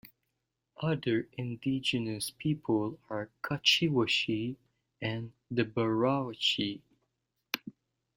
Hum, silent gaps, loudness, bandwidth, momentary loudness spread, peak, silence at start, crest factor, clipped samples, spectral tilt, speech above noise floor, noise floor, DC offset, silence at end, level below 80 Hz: none; none; -31 LUFS; 16 kHz; 12 LU; -8 dBFS; 0.05 s; 24 dB; under 0.1%; -4.5 dB/octave; 52 dB; -84 dBFS; under 0.1%; 0.45 s; -66 dBFS